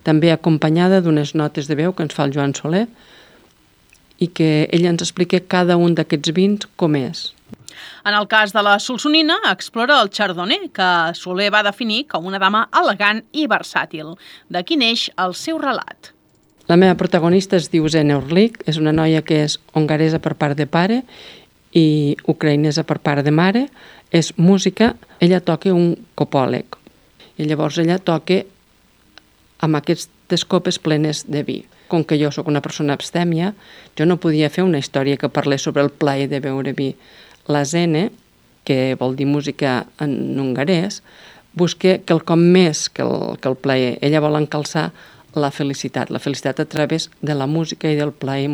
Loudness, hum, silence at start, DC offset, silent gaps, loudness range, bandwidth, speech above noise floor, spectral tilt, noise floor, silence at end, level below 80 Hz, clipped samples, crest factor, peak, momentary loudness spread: -17 LUFS; none; 0.05 s; under 0.1%; none; 5 LU; over 20 kHz; 38 dB; -5.5 dB/octave; -55 dBFS; 0 s; -56 dBFS; under 0.1%; 18 dB; 0 dBFS; 9 LU